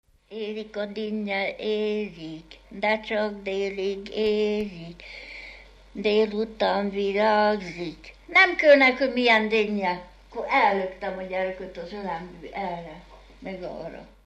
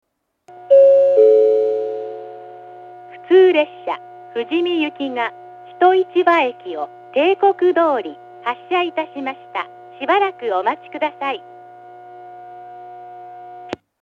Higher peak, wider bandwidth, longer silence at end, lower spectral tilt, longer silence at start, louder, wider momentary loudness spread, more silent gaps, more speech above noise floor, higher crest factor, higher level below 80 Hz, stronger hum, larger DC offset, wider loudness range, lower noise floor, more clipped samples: second, -4 dBFS vs 0 dBFS; first, 8.6 kHz vs 5.8 kHz; about the same, 0.2 s vs 0.25 s; about the same, -5.5 dB/octave vs -5.5 dB/octave; second, 0.3 s vs 0.55 s; second, -24 LUFS vs -17 LUFS; second, 20 LU vs 25 LU; neither; about the same, 22 dB vs 22 dB; about the same, 20 dB vs 18 dB; first, -54 dBFS vs -76 dBFS; neither; neither; about the same, 8 LU vs 7 LU; first, -47 dBFS vs -40 dBFS; neither